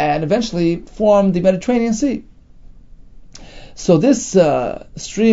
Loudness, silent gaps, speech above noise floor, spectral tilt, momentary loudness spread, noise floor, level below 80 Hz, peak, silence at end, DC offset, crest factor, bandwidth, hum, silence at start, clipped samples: -16 LUFS; none; 25 dB; -6 dB/octave; 11 LU; -40 dBFS; -40 dBFS; 0 dBFS; 0 s; under 0.1%; 16 dB; 8 kHz; none; 0 s; under 0.1%